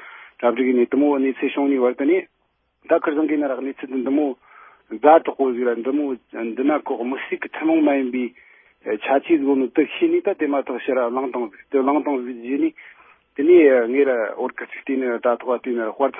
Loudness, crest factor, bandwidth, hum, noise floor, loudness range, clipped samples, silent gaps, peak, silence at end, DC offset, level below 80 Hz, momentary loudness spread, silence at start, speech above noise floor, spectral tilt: -20 LUFS; 20 dB; 3.7 kHz; none; -69 dBFS; 3 LU; under 0.1%; none; 0 dBFS; 0 s; under 0.1%; -72 dBFS; 12 LU; 0 s; 49 dB; -10 dB/octave